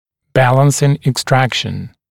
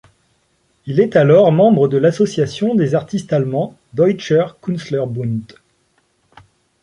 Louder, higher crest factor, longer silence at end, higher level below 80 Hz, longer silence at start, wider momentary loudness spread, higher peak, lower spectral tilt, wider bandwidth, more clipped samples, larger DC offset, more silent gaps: about the same, -14 LUFS vs -16 LUFS; about the same, 14 dB vs 14 dB; second, 0.25 s vs 1.4 s; first, -46 dBFS vs -56 dBFS; second, 0.35 s vs 0.85 s; second, 9 LU vs 12 LU; about the same, 0 dBFS vs -2 dBFS; second, -5 dB/octave vs -7.5 dB/octave; first, 16 kHz vs 11 kHz; neither; neither; neither